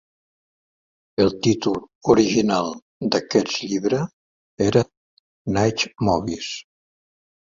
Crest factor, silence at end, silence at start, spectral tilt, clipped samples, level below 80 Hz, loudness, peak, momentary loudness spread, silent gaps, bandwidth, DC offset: 20 dB; 0.95 s; 1.2 s; -5 dB/octave; under 0.1%; -50 dBFS; -22 LUFS; -2 dBFS; 12 LU; 1.95-2.01 s, 2.82-3.01 s, 4.13-4.57 s, 4.97-5.45 s; 7.6 kHz; under 0.1%